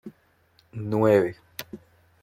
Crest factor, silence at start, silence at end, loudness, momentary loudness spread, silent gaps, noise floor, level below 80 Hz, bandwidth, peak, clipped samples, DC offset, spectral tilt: 20 dB; 0.05 s; 0.45 s; -23 LUFS; 23 LU; none; -63 dBFS; -66 dBFS; 16.5 kHz; -8 dBFS; under 0.1%; under 0.1%; -7 dB/octave